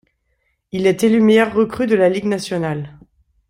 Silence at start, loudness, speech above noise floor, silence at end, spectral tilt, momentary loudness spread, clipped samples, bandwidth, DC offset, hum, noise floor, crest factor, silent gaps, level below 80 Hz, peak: 0.75 s; -16 LUFS; 52 dB; 0.6 s; -6 dB/octave; 14 LU; under 0.1%; 15.5 kHz; under 0.1%; none; -67 dBFS; 16 dB; none; -54 dBFS; -2 dBFS